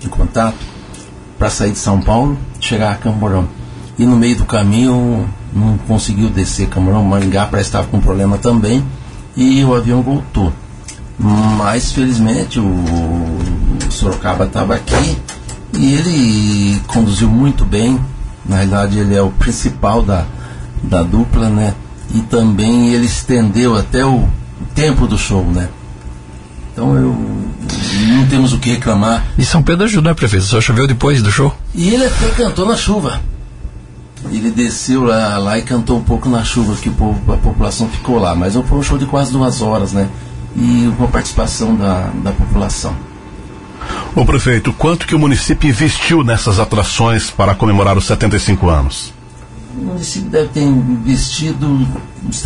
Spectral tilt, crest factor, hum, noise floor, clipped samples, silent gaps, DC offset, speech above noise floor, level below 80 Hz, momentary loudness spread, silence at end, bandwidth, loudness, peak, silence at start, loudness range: -6 dB/octave; 12 dB; none; -32 dBFS; under 0.1%; none; under 0.1%; 20 dB; -22 dBFS; 12 LU; 0 s; 11 kHz; -13 LUFS; -2 dBFS; 0 s; 4 LU